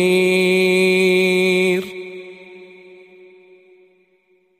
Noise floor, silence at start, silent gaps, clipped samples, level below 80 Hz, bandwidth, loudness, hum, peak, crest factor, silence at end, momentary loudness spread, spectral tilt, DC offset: -60 dBFS; 0 s; none; under 0.1%; -68 dBFS; 15.5 kHz; -15 LUFS; none; -6 dBFS; 14 dB; 1.95 s; 19 LU; -5 dB/octave; under 0.1%